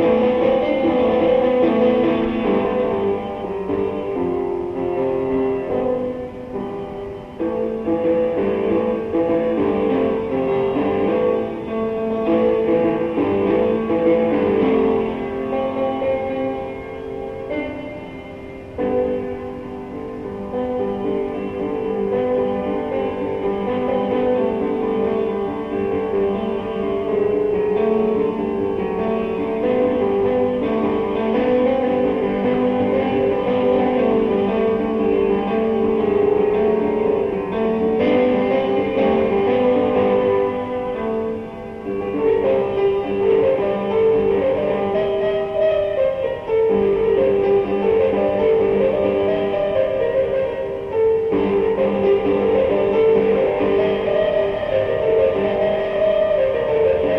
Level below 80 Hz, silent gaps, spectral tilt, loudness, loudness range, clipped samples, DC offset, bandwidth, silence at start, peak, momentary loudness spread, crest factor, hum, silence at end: -44 dBFS; none; -8.5 dB/octave; -19 LUFS; 6 LU; under 0.1%; under 0.1%; 5.6 kHz; 0 s; -6 dBFS; 8 LU; 14 dB; none; 0 s